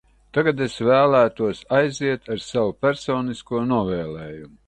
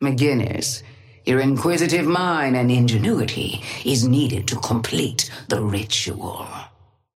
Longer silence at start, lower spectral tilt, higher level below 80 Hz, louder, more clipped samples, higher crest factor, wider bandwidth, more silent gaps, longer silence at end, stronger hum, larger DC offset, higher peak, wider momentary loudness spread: first, 0.35 s vs 0 s; about the same, -6 dB/octave vs -5 dB/octave; about the same, -52 dBFS vs -54 dBFS; about the same, -21 LUFS vs -21 LUFS; neither; about the same, 16 dB vs 16 dB; second, 9.2 kHz vs 16 kHz; neither; second, 0.2 s vs 0.5 s; neither; neither; about the same, -6 dBFS vs -4 dBFS; about the same, 10 LU vs 10 LU